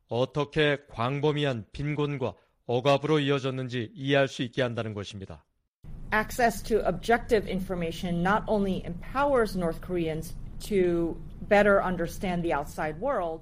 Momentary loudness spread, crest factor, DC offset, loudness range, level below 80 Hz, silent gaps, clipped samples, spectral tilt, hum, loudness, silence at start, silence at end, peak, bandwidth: 9 LU; 18 dB; under 0.1%; 2 LU; -44 dBFS; 5.68-5.83 s; under 0.1%; -6 dB/octave; none; -28 LUFS; 0.1 s; 0 s; -10 dBFS; 15.5 kHz